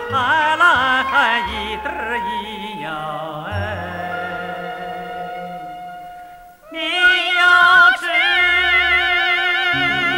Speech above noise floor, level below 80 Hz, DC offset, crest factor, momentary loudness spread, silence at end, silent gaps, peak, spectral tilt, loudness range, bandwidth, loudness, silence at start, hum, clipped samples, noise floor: 21 dB; -46 dBFS; under 0.1%; 16 dB; 17 LU; 0 s; none; -2 dBFS; -3 dB/octave; 14 LU; 16.5 kHz; -15 LUFS; 0 s; none; under 0.1%; -40 dBFS